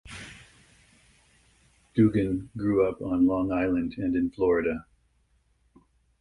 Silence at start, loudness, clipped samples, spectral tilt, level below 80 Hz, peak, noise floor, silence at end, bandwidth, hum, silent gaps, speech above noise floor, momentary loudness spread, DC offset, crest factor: 0.05 s; -26 LUFS; under 0.1%; -8.5 dB/octave; -52 dBFS; -10 dBFS; -67 dBFS; 1.4 s; 11.5 kHz; none; none; 42 dB; 12 LU; under 0.1%; 18 dB